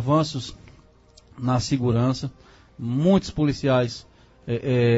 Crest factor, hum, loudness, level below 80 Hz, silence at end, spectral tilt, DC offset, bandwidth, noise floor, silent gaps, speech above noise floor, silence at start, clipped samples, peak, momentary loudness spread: 16 dB; none; -23 LUFS; -48 dBFS; 0 s; -7 dB/octave; under 0.1%; 8 kHz; -53 dBFS; none; 32 dB; 0 s; under 0.1%; -6 dBFS; 15 LU